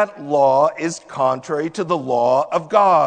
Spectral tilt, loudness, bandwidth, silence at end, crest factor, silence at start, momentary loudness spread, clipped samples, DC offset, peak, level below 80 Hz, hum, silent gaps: -5.5 dB/octave; -18 LUFS; 9.4 kHz; 0 s; 16 dB; 0 s; 8 LU; under 0.1%; under 0.1%; -2 dBFS; -66 dBFS; none; none